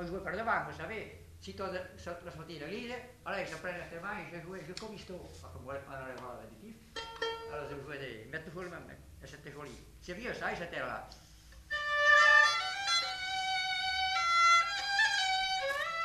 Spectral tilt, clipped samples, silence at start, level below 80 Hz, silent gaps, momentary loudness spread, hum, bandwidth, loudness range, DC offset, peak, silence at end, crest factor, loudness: -2 dB/octave; under 0.1%; 0 s; -60 dBFS; none; 24 LU; none; 14 kHz; 16 LU; under 0.1%; -14 dBFS; 0 s; 22 dB; -31 LUFS